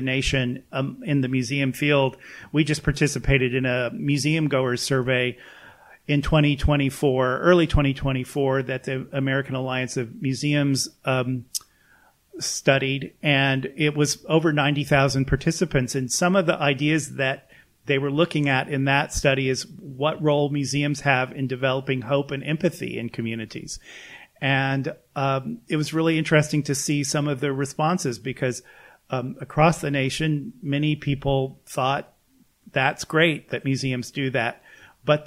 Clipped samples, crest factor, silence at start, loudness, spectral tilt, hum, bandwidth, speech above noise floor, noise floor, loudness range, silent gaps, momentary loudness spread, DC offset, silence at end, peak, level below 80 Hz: under 0.1%; 20 dB; 0 s; -23 LUFS; -5 dB/octave; none; 15.5 kHz; 38 dB; -61 dBFS; 4 LU; none; 9 LU; under 0.1%; 0 s; -4 dBFS; -40 dBFS